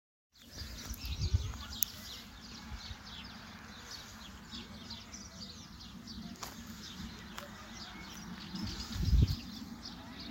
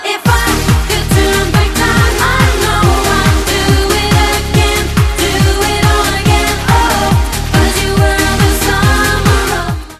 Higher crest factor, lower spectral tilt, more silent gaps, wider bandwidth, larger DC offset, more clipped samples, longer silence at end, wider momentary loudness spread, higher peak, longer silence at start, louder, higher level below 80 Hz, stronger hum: first, 34 dB vs 10 dB; about the same, -4 dB/octave vs -4.5 dB/octave; neither; first, 16 kHz vs 14.5 kHz; neither; neither; about the same, 0 s vs 0.05 s; first, 14 LU vs 2 LU; second, -6 dBFS vs 0 dBFS; first, 0.35 s vs 0 s; second, -41 LUFS vs -11 LUFS; second, -44 dBFS vs -16 dBFS; neither